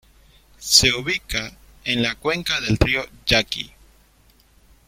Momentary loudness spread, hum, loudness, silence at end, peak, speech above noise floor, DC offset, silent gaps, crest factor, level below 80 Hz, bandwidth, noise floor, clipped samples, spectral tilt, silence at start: 16 LU; none; -19 LUFS; 1.2 s; 0 dBFS; 35 dB; under 0.1%; none; 24 dB; -38 dBFS; 16.5 kHz; -56 dBFS; under 0.1%; -2.5 dB/octave; 0.6 s